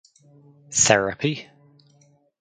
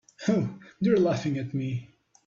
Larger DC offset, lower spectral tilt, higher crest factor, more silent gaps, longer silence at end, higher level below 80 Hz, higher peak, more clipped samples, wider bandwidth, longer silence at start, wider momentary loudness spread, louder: neither; second, -2.5 dB/octave vs -7.5 dB/octave; first, 26 dB vs 16 dB; neither; first, 1 s vs 0.4 s; first, -58 dBFS vs -64 dBFS; first, 0 dBFS vs -12 dBFS; neither; first, 9.6 kHz vs 7.6 kHz; first, 0.7 s vs 0.2 s; about the same, 11 LU vs 11 LU; first, -20 LUFS vs -28 LUFS